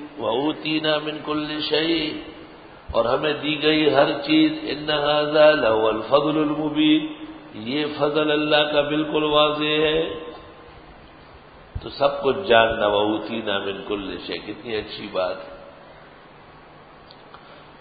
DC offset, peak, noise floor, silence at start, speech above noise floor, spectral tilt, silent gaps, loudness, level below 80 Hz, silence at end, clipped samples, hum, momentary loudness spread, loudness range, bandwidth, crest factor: under 0.1%; -2 dBFS; -46 dBFS; 0 s; 25 dB; -9.5 dB/octave; none; -21 LUFS; -50 dBFS; 0.1 s; under 0.1%; none; 17 LU; 10 LU; 5 kHz; 20 dB